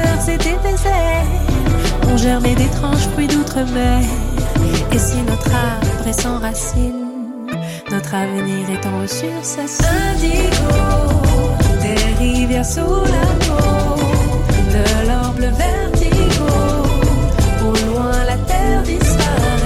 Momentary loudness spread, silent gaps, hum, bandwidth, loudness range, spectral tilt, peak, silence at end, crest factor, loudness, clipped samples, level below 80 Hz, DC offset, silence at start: 6 LU; none; none; 16 kHz; 4 LU; -5.5 dB/octave; -2 dBFS; 0 s; 12 dB; -16 LUFS; under 0.1%; -18 dBFS; under 0.1%; 0 s